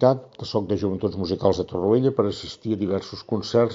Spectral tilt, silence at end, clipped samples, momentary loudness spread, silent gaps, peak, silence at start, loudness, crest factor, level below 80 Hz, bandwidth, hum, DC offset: -6.5 dB/octave; 0 s; under 0.1%; 8 LU; none; -4 dBFS; 0 s; -24 LUFS; 20 dB; -54 dBFS; 7.4 kHz; none; under 0.1%